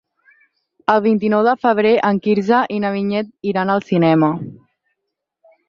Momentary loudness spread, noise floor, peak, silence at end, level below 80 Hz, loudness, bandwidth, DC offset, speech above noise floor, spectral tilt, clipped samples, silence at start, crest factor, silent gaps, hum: 8 LU; -78 dBFS; -2 dBFS; 1.15 s; -62 dBFS; -17 LUFS; 6.8 kHz; under 0.1%; 62 dB; -8 dB/octave; under 0.1%; 0.9 s; 16 dB; none; none